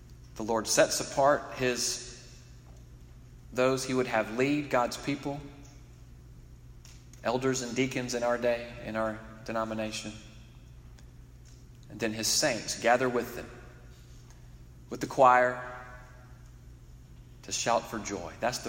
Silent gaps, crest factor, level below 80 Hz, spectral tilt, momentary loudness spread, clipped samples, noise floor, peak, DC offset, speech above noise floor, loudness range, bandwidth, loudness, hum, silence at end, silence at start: none; 24 dB; -54 dBFS; -3.5 dB/octave; 23 LU; under 0.1%; -51 dBFS; -8 dBFS; under 0.1%; 22 dB; 6 LU; 16 kHz; -29 LUFS; none; 0 s; 0 s